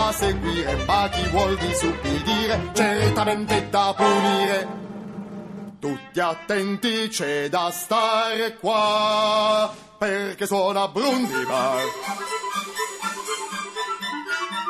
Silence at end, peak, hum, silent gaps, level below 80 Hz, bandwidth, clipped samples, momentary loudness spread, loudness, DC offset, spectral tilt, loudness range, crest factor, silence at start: 0 s; -6 dBFS; none; none; -40 dBFS; 14.5 kHz; under 0.1%; 9 LU; -23 LUFS; under 0.1%; -4 dB/octave; 4 LU; 18 dB; 0 s